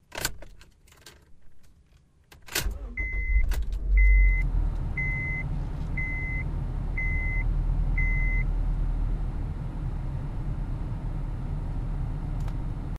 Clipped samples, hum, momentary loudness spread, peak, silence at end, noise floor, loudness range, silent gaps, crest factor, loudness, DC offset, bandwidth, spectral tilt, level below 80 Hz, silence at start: under 0.1%; none; 8 LU; -10 dBFS; 0 s; -59 dBFS; 6 LU; none; 18 dB; -30 LUFS; under 0.1%; 15.5 kHz; -5 dB/octave; -28 dBFS; 0.15 s